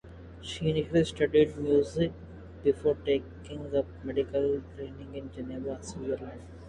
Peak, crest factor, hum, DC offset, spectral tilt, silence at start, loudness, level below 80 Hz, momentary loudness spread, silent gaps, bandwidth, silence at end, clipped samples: -12 dBFS; 18 dB; none; under 0.1%; -6.5 dB/octave; 0.05 s; -30 LUFS; -50 dBFS; 17 LU; none; 10.5 kHz; 0 s; under 0.1%